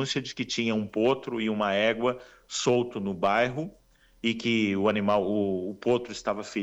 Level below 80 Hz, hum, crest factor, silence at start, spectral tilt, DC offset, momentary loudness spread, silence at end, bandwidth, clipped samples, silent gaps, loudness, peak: -62 dBFS; none; 16 dB; 0 s; -4.5 dB/octave; under 0.1%; 7 LU; 0 s; 8.4 kHz; under 0.1%; none; -27 LUFS; -12 dBFS